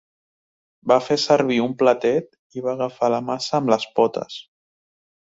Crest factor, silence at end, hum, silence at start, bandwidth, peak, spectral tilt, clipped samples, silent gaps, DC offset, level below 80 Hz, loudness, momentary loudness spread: 20 dB; 0.9 s; none; 0.85 s; 8 kHz; -2 dBFS; -5 dB/octave; under 0.1%; 2.39-2.50 s; under 0.1%; -66 dBFS; -20 LUFS; 13 LU